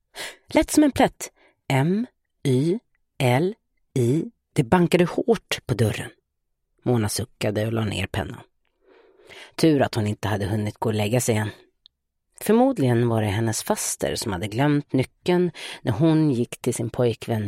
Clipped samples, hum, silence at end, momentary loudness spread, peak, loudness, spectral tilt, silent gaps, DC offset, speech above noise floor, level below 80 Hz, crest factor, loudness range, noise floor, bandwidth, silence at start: under 0.1%; none; 0 s; 11 LU; -2 dBFS; -23 LUFS; -5.5 dB/octave; none; under 0.1%; 54 dB; -52 dBFS; 20 dB; 3 LU; -75 dBFS; 16 kHz; 0.15 s